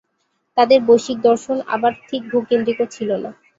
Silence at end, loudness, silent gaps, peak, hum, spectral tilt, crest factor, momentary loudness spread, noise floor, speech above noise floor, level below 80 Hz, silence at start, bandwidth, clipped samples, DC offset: 0.25 s; -18 LUFS; none; -2 dBFS; none; -4.5 dB/octave; 16 dB; 10 LU; -69 dBFS; 52 dB; -62 dBFS; 0.55 s; 7.8 kHz; under 0.1%; under 0.1%